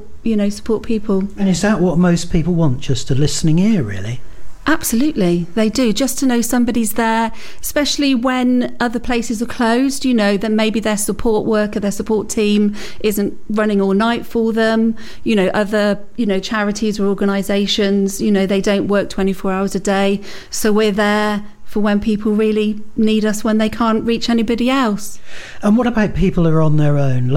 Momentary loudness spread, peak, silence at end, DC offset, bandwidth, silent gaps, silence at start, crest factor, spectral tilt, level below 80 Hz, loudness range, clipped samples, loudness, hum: 6 LU; -2 dBFS; 0 s; under 0.1%; 16.5 kHz; none; 0 s; 14 dB; -5.5 dB/octave; -34 dBFS; 1 LU; under 0.1%; -16 LUFS; none